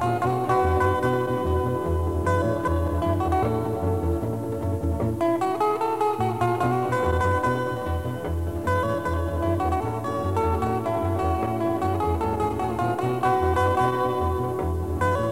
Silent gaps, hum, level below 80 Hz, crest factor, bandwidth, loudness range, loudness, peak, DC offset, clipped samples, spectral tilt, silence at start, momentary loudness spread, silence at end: none; none; -36 dBFS; 14 dB; 16 kHz; 2 LU; -24 LUFS; -8 dBFS; 0.4%; under 0.1%; -7.5 dB/octave; 0 s; 5 LU; 0 s